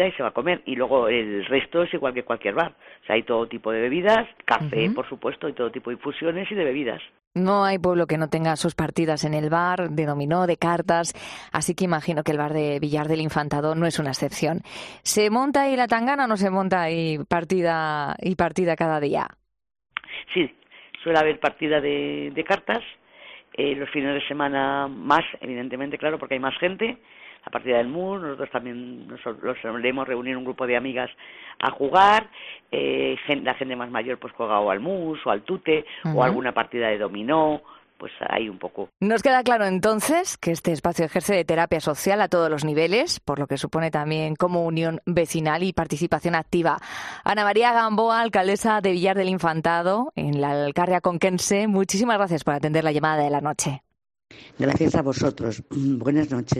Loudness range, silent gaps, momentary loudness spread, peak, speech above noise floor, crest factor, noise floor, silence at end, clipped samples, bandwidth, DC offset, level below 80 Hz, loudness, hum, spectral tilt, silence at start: 4 LU; 7.27-7.31 s; 9 LU; -4 dBFS; 24 dB; 18 dB; -47 dBFS; 0 s; under 0.1%; 14 kHz; under 0.1%; -56 dBFS; -23 LUFS; none; -5 dB/octave; 0 s